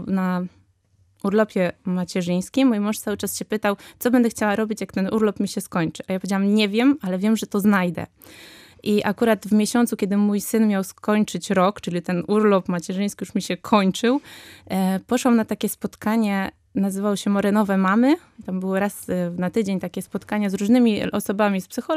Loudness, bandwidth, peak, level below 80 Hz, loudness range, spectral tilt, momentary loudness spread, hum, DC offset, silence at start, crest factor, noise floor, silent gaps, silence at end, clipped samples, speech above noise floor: -22 LUFS; 15.5 kHz; -4 dBFS; -60 dBFS; 2 LU; -5.5 dB/octave; 8 LU; none; under 0.1%; 0 s; 18 dB; -61 dBFS; none; 0 s; under 0.1%; 40 dB